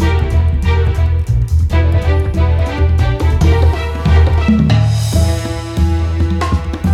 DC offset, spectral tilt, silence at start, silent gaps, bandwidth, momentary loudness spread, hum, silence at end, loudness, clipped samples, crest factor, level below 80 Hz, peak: under 0.1%; -7 dB/octave; 0 s; none; 12 kHz; 5 LU; none; 0 s; -14 LUFS; under 0.1%; 10 dB; -18 dBFS; -2 dBFS